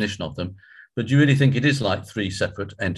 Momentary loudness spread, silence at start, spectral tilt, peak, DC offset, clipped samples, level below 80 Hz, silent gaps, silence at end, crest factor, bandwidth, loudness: 14 LU; 0 s; -6 dB/octave; -6 dBFS; under 0.1%; under 0.1%; -46 dBFS; none; 0 s; 16 dB; 12 kHz; -22 LUFS